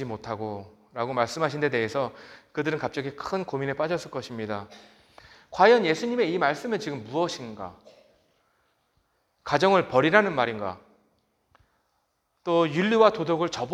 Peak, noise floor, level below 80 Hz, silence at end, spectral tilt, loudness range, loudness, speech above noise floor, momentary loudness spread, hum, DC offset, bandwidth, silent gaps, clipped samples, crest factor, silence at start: -2 dBFS; -73 dBFS; -66 dBFS; 0 s; -5.5 dB/octave; 6 LU; -25 LUFS; 48 dB; 17 LU; none; under 0.1%; 12 kHz; none; under 0.1%; 26 dB; 0 s